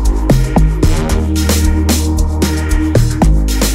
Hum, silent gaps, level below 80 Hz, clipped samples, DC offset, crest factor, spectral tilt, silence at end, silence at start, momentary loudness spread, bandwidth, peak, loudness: none; none; -14 dBFS; under 0.1%; 1%; 10 dB; -5.5 dB/octave; 0 s; 0 s; 3 LU; 16.5 kHz; 0 dBFS; -13 LUFS